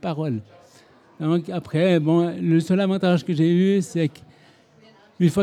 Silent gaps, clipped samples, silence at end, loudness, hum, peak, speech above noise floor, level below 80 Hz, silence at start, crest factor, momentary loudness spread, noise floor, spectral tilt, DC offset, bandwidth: none; under 0.1%; 0 s; -21 LUFS; none; -6 dBFS; 33 dB; -66 dBFS; 0.05 s; 14 dB; 9 LU; -53 dBFS; -7.5 dB/octave; under 0.1%; 11.5 kHz